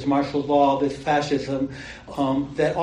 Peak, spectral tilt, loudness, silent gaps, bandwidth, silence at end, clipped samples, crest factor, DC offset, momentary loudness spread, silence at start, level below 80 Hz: -6 dBFS; -6.5 dB/octave; -23 LUFS; none; 9.8 kHz; 0 s; under 0.1%; 16 dB; under 0.1%; 10 LU; 0 s; -50 dBFS